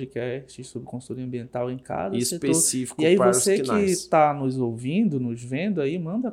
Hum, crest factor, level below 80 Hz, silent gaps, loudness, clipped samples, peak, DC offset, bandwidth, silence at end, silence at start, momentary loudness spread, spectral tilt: none; 20 dB; -62 dBFS; none; -23 LUFS; under 0.1%; -4 dBFS; under 0.1%; 16.5 kHz; 0 s; 0 s; 15 LU; -4.5 dB/octave